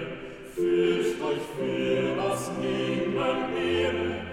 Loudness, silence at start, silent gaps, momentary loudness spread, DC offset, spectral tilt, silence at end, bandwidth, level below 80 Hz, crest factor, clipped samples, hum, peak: -27 LUFS; 0 s; none; 6 LU; under 0.1%; -5.5 dB/octave; 0 s; 15 kHz; -56 dBFS; 14 dB; under 0.1%; none; -14 dBFS